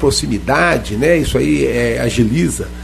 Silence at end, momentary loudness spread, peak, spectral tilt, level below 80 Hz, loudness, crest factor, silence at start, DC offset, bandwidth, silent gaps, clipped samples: 0 s; 3 LU; 0 dBFS; -5 dB/octave; -28 dBFS; -15 LUFS; 14 dB; 0 s; under 0.1%; 13.5 kHz; none; under 0.1%